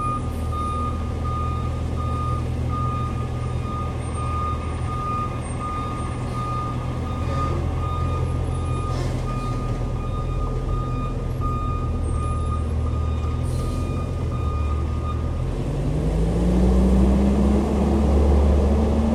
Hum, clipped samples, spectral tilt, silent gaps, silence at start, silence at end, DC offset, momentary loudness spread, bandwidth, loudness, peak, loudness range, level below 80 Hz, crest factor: none; under 0.1%; -8 dB/octave; none; 0 s; 0 s; under 0.1%; 8 LU; 11.5 kHz; -24 LUFS; -6 dBFS; 6 LU; -26 dBFS; 16 dB